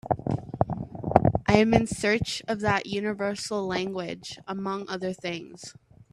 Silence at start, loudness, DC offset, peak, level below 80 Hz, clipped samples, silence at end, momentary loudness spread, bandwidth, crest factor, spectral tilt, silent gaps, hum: 0.05 s; -27 LUFS; under 0.1%; 0 dBFS; -48 dBFS; under 0.1%; 0.4 s; 14 LU; 13 kHz; 26 dB; -5.5 dB/octave; none; none